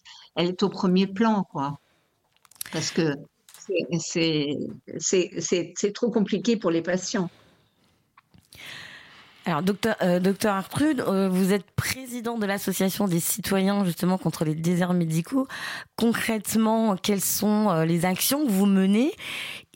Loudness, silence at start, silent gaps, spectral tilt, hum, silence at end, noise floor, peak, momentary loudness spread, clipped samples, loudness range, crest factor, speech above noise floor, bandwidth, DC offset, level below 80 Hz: -25 LUFS; 0.05 s; none; -5 dB/octave; none; 0.15 s; -68 dBFS; -10 dBFS; 11 LU; under 0.1%; 6 LU; 16 dB; 44 dB; 16.5 kHz; under 0.1%; -60 dBFS